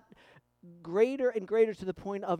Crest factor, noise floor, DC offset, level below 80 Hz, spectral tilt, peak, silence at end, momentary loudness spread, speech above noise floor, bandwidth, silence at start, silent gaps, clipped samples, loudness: 18 dB; -61 dBFS; under 0.1%; -68 dBFS; -7 dB/octave; -14 dBFS; 0 s; 10 LU; 31 dB; 9.2 kHz; 0.65 s; none; under 0.1%; -30 LUFS